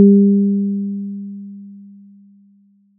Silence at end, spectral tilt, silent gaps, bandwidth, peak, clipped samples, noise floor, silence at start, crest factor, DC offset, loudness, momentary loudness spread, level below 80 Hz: 1.15 s; -22 dB/octave; none; 0.5 kHz; -2 dBFS; under 0.1%; -53 dBFS; 0 s; 16 dB; under 0.1%; -16 LUFS; 24 LU; -90 dBFS